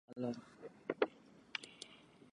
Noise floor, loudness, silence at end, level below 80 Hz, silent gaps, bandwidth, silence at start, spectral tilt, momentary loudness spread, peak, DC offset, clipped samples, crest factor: -60 dBFS; -44 LUFS; 0.05 s; -84 dBFS; none; 11 kHz; 0.1 s; -5 dB/octave; 18 LU; -18 dBFS; under 0.1%; under 0.1%; 28 dB